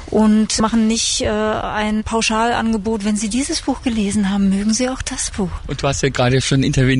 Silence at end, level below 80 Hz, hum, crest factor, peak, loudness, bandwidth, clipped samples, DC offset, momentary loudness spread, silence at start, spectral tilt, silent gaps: 0 s; -34 dBFS; none; 12 dB; -6 dBFS; -17 LUFS; 11 kHz; under 0.1%; under 0.1%; 6 LU; 0 s; -4.5 dB/octave; none